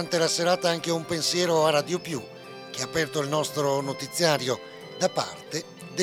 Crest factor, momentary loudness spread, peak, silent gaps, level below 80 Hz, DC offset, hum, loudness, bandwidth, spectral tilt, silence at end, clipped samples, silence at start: 20 dB; 12 LU; -6 dBFS; none; -66 dBFS; under 0.1%; none; -26 LUFS; 17.5 kHz; -3.5 dB/octave; 0 s; under 0.1%; 0 s